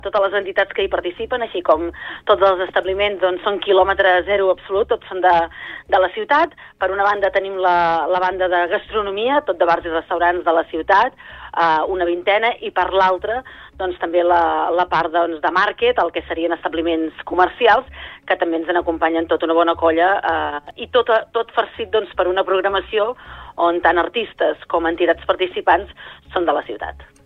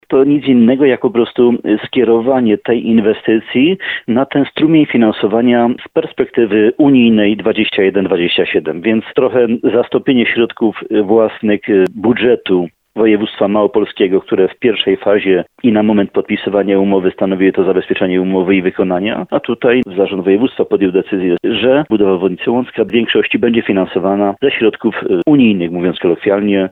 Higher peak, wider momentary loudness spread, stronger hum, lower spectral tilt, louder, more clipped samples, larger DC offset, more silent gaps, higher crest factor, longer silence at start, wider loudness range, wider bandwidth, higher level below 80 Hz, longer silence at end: about the same, -2 dBFS vs 0 dBFS; first, 8 LU vs 5 LU; neither; second, -6 dB/octave vs -9 dB/octave; second, -18 LUFS vs -13 LUFS; neither; neither; neither; about the same, 16 dB vs 12 dB; about the same, 0.05 s vs 0.1 s; about the same, 2 LU vs 2 LU; first, 6.6 kHz vs 4.2 kHz; first, -46 dBFS vs -52 dBFS; first, 0.2 s vs 0.05 s